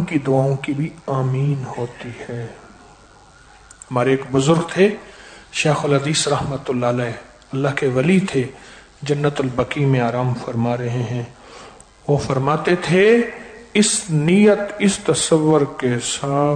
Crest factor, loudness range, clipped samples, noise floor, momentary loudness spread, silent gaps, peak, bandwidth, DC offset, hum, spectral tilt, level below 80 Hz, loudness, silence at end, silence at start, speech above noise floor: 16 dB; 7 LU; under 0.1%; -47 dBFS; 14 LU; none; -4 dBFS; 9.4 kHz; under 0.1%; none; -5.5 dB/octave; -50 dBFS; -19 LUFS; 0 s; 0 s; 29 dB